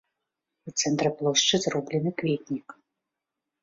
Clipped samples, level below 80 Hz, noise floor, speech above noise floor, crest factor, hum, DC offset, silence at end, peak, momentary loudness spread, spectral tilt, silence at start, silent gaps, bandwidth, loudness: under 0.1%; -66 dBFS; -86 dBFS; 59 dB; 20 dB; none; under 0.1%; 0.9 s; -8 dBFS; 10 LU; -3.5 dB/octave; 0.65 s; none; 7.8 kHz; -26 LUFS